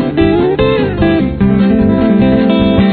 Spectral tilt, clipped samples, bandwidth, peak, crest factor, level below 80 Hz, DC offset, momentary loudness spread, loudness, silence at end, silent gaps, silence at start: -11 dB/octave; under 0.1%; 4.5 kHz; 0 dBFS; 10 dB; -26 dBFS; under 0.1%; 2 LU; -10 LUFS; 0 s; none; 0 s